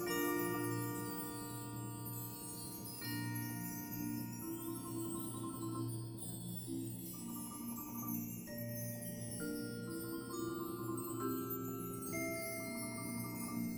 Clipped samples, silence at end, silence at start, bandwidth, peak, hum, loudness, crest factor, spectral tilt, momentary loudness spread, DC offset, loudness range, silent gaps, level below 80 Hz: under 0.1%; 0 s; 0 s; over 20 kHz; -26 dBFS; none; -43 LUFS; 16 dB; -5 dB/octave; 5 LU; under 0.1%; 2 LU; none; -68 dBFS